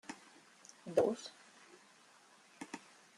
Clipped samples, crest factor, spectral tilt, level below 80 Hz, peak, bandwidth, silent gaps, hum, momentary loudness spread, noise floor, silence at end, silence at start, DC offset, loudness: under 0.1%; 26 dB; -4.5 dB/octave; -84 dBFS; -18 dBFS; 13 kHz; none; none; 28 LU; -65 dBFS; 0.4 s; 0.1 s; under 0.1%; -39 LUFS